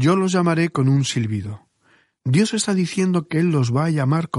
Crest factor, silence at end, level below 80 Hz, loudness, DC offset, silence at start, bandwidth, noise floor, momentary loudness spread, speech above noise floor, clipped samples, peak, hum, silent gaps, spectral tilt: 14 dB; 0 s; -58 dBFS; -20 LUFS; under 0.1%; 0 s; 11.5 kHz; -60 dBFS; 8 LU; 41 dB; under 0.1%; -4 dBFS; none; none; -6 dB/octave